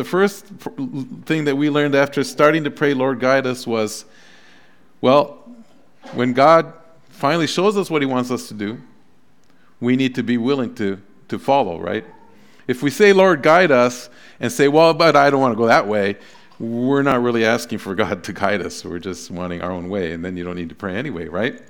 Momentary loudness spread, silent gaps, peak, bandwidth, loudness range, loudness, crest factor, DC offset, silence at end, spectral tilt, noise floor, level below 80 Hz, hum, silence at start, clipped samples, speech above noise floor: 16 LU; none; 0 dBFS; 19 kHz; 8 LU; -18 LUFS; 18 dB; 0.5%; 0.1 s; -5.5 dB/octave; -57 dBFS; -58 dBFS; none; 0 s; under 0.1%; 40 dB